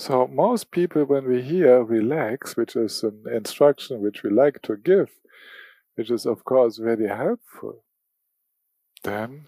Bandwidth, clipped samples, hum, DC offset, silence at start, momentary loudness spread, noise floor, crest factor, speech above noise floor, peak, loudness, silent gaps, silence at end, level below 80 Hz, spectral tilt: 15.5 kHz; under 0.1%; none; under 0.1%; 0 s; 12 LU; -76 dBFS; 18 dB; 55 dB; -4 dBFS; -22 LUFS; none; 0.05 s; -76 dBFS; -6 dB/octave